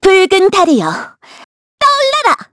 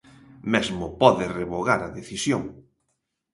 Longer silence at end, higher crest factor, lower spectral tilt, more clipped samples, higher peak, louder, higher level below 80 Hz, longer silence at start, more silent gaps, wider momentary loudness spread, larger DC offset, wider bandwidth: second, 0.1 s vs 0.75 s; second, 12 dB vs 24 dB; second, -3.5 dB/octave vs -5 dB/octave; neither; about the same, 0 dBFS vs 0 dBFS; first, -10 LUFS vs -24 LUFS; first, -46 dBFS vs -52 dBFS; second, 0 s vs 0.45 s; first, 1.44-1.78 s vs none; about the same, 12 LU vs 13 LU; neither; about the same, 11 kHz vs 11.5 kHz